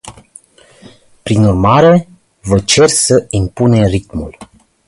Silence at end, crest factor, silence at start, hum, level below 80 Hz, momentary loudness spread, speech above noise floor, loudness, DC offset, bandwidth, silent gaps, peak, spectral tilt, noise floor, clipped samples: 0.45 s; 12 dB; 0.05 s; none; -32 dBFS; 16 LU; 32 dB; -11 LUFS; under 0.1%; 11.5 kHz; none; 0 dBFS; -5 dB/octave; -43 dBFS; under 0.1%